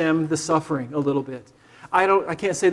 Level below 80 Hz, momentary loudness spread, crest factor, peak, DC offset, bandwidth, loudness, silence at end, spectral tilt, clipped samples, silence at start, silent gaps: -60 dBFS; 8 LU; 18 dB; -4 dBFS; under 0.1%; 12 kHz; -22 LUFS; 0 s; -5 dB/octave; under 0.1%; 0 s; none